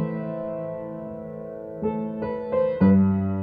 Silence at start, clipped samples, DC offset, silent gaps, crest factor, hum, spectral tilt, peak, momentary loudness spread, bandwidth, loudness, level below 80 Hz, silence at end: 0 s; under 0.1%; under 0.1%; none; 16 dB; none; -12 dB/octave; -8 dBFS; 17 LU; 4.5 kHz; -24 LUFS; -54 dBFS; 0 s